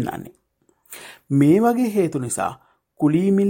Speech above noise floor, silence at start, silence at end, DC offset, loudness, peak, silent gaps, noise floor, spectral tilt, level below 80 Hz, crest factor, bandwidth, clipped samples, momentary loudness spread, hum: 45 dB; 0 s; 0 s; under 0.1%; -20 LUFS; -4 dBFS; none; -63 dBFS; -7 dB/octave; -60 dBFS; 16 dB; 17 kHz; under 0.1%; 23 LU; none